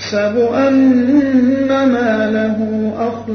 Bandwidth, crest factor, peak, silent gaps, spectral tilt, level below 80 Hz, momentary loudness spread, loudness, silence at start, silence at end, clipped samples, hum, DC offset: 6.4 kHz; 12 dB; -2 dBFS; none; -6.5 dB/octave; -52 dBFS; 7 LU; -14 LUFS; 0 s; 0 s; under 0.1%; 50 Hz at -35 dBFS; under 0.1%